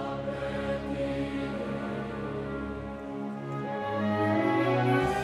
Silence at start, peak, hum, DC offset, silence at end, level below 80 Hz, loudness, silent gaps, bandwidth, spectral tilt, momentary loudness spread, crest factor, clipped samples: 0 s; -14 dBFS; none; under 0.1%; 0 s; -50 dBFS; -31 LUFS; none; 13 kHz; -7.5 dB/octave; 10 LU; 16 dB; under 0.1%